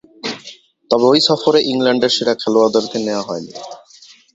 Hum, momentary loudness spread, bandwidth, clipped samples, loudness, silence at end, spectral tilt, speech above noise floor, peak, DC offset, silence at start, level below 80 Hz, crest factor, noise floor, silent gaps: none; 17 LU; 8 kHz; under 0.1%; -15 LUFS; 0.6 s; -4 dB/octave; 30 dB; 0 dBFS; under 0.1%; 0.25 s; -62 dBFS; 16 dB; -45 dBFS; none